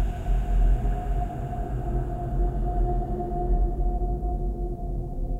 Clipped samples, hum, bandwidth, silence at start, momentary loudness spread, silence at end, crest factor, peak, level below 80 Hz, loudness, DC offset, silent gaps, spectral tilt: under 0.1%; none; 3.1 kHz; 0 s; 6 LU; 0 s; 12 dB; -12 dBFS; -26 dBFS; -29 LUFS; under 0.1%; none; -9.5 dB/octave